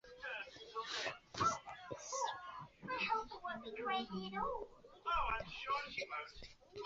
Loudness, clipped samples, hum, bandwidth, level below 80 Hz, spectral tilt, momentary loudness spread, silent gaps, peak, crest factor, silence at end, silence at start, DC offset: -42 LUFS; under 0.1%; none; 7.6 kHz; -62 dBFS; -1.5 dB/octave; 12 LU; none; -24 dBFS; 18 dB; 0 s; 0.05 s; under 0.1%